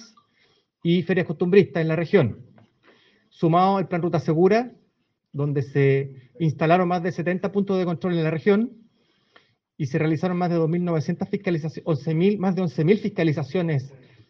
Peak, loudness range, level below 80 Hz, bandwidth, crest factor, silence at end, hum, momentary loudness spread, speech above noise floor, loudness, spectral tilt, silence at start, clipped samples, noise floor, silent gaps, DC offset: -4 dBFS; 3 LU; -66 dBFS; 6.6 kHz; 18 dB; 0.4 s; none; 8 LU; 49 dB; -23 LUFS; -8.5 dB/octave; 0 s; under 0.1%; -70 dBFS; none; under 0.1%